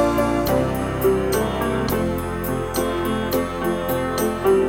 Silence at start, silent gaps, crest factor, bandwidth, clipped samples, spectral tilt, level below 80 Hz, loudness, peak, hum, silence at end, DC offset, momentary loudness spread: 0 s; none; 14 dB; 17.5 kHz; under 0.1%; -5.5 dB/octave; -36 dBFS; -22 LUFS; -6 dBFS; none; 0 s; under 0.1%; 4 LU